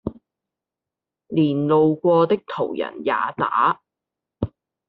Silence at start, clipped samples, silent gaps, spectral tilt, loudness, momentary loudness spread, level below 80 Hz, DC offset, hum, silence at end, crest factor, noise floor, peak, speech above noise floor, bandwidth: 0.05 s; under 0.1%; none; -6 dB/octave; -21 LUFS; 14 LU; -54 dBFS; under 0.1%; none; 0.4 s; 16 dB; -87 dBFS; -6 dBFS; 68 dB; 4.9 kHz